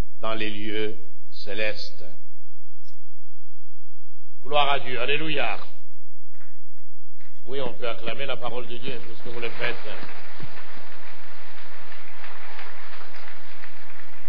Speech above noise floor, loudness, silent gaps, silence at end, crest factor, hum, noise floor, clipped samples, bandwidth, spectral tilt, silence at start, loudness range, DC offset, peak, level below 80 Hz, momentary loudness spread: 56 dB; -30 LUFS; none; 0 s; 24 dB; none; -86 dBFS; under 0.1%; 5.4 kHz; -6.5 dB/octave; 0.2 s; 14 LU; 20%; -4 dBFS; -64 dBFS; 20 LU